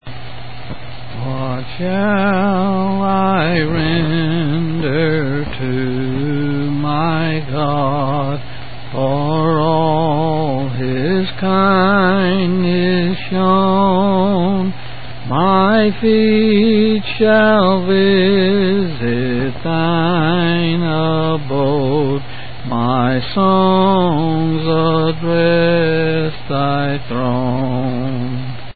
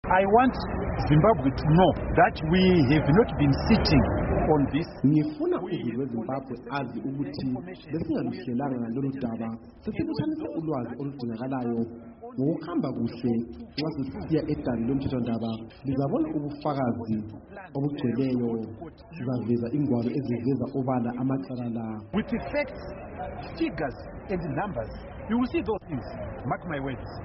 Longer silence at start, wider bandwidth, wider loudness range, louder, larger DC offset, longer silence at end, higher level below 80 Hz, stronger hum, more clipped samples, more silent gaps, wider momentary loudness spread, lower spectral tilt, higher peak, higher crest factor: about the same, 0 s vs 0.05 s; second, 4.8 kHz vs 5.8 kHz; second, 5 LU vs 9 LU; first, -15 LUFS vs -27 LUFS; first, 6% vs under 0.1%; about the same, 0 s vs 0 s; about the same, -40 dBFS vs -42 dBFS; neither; neither; neither; second, 10 LU vs 14 LU; first, -12.5 dB/octave vs -6.5 dB/octave; first, 0 dBFS vs -8 dBFS; second, 14 dB vs 20 dB